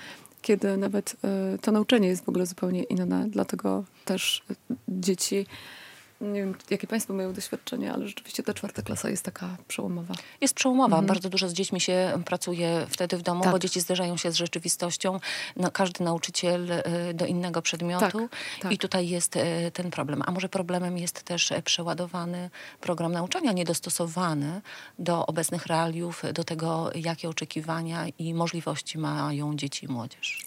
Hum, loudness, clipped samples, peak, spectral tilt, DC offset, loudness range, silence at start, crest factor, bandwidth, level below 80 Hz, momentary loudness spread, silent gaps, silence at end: none; -28 LUFS; under 0.1%; -8 dBFS; -4 dB/octave; under 0.1%; 5 LU; 0 s; 20 dB; 16 kHz; -72 dBFS; 9 LU; none; 0 s